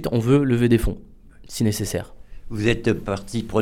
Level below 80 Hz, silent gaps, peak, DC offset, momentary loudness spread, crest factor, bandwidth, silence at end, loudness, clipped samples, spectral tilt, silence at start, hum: -36 dBFS; none; -4 dBFS; under 0.1%; 17 LU; 16 dB; 16.5 kHz; 0 s; -22 LUFS; under 0.1%; -6.5 dB/octave; 0 s; none